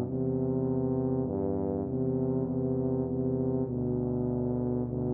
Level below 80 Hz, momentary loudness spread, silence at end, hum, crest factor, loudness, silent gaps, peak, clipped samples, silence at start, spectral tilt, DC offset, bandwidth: -50 dBFS; 2 LU; 0 s; none; 12 dB; -30 LUFS; none; -18 dBFS; under 0.1%; 0 s; -15.5 dB/octave; under 0.1%; 1.9 kHz